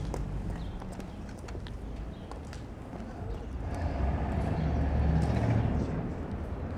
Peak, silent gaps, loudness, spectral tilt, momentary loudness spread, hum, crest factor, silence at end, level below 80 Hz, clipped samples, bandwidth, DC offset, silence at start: -16 dBFS; none; -34 LUFS; -8 dB/octave; 14 LU; none; 16 dB; 0 s; -36 dBFS; under 0.1%; 10 kHz; under 0.1%; 0 s